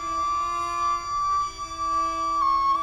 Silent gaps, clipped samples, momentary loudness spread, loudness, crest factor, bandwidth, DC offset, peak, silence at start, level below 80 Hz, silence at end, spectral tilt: none; under 0.1%; 5 LU; -25 LUFS; 10 dB; 12.5 kHz; under 0.1%; -14 dBFS; 0 s; -48 dBFS; 0 s; -2.5 dB/octave